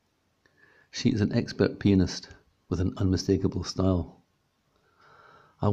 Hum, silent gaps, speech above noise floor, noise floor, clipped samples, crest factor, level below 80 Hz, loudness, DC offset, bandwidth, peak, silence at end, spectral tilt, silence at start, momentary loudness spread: none; none; 46 dB; -71 dBFS; under 0.1%; 20 dB; -54 dBFS; -27 LUFS; under 0.1%; 8 kHz; -8 dBFS; 0 s; -6.5 dB/octave; 0.95 s; 10 LU